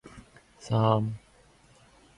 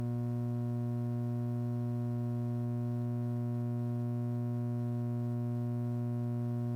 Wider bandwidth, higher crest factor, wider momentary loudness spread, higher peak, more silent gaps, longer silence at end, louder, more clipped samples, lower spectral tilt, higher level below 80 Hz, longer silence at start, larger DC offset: first, 11 kHz vs 3 kHz; first, 24 dB vs 6 dB; first, 24 LU vs 0 LU; first, -8 dBFS vs -28 dBFS; neither; first, 1 s vs 0 s; first, -27 LUFS vs -36 LUFS; neither; second, -7.5 dB/octave vs -10.5 dB/octave; about the same, -60 dBFS vs -64 dBFS; about the same, 0.05 s vs 0 s; neither